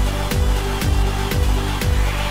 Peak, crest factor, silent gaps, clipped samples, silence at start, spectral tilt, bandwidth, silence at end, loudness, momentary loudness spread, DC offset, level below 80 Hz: -8 dBFS; 10 dB; none; under 0.1%; 0 s; -5 dB/octave; 16.5 kHz; 0 s; -20 LUFS; 1 LU; under 0.1%; -20 dBFS